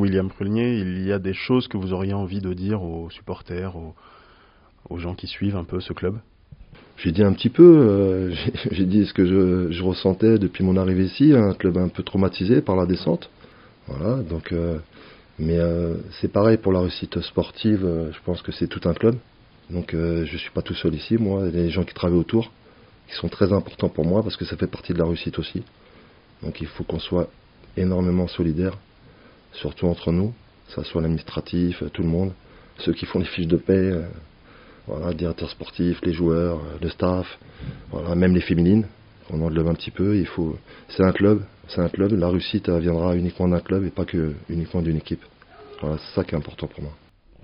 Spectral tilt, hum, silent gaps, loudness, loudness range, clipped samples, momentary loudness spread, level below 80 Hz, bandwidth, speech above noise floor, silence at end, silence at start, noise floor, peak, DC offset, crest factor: -7 dB/octave; none; none; -22 LUFS; 9 LU; under 0.1%; 14 LU; -42 dBFS; 5.4 kHz; 32 dB; 0.5 s; 0 s; -54 dBFS; 0 dBFS; under 0.1%; 22 dB